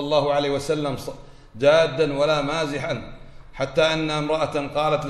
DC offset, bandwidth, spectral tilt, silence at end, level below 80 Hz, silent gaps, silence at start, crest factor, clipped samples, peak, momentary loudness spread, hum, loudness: under 0.1%; 13 kHz; -5 dB/octave; 0 s; -44 dBFS; none; 0 s; 16 dB; under 0.1%; -6 dBFS; 12 LU; none; -22 LUFS